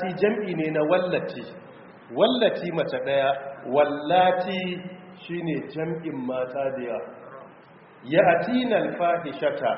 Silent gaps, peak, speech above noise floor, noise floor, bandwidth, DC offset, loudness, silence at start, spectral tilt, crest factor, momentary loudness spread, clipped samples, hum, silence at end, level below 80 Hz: none; -6 dBFS; 26 dB; -50 dBFS; 5.8 kHz; under 0.1%; -25 LUFS; 0 s; -4 dB/octave; 20 dB; 18 LU; under 0.1%; none; 0 s; -68 dBFS